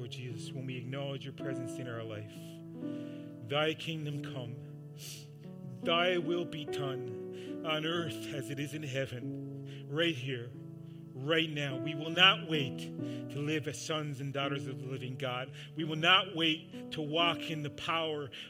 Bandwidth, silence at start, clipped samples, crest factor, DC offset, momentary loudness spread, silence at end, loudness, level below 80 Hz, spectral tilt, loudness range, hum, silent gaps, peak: 16.5 kHz; 0 s; under 0.1%; 26 dB; under 0.1%; 16 LU; 0 s; -34 LUFS; -76 dBFS; -4.5 dB/octave; 8 LU; none; none; -10 dBFS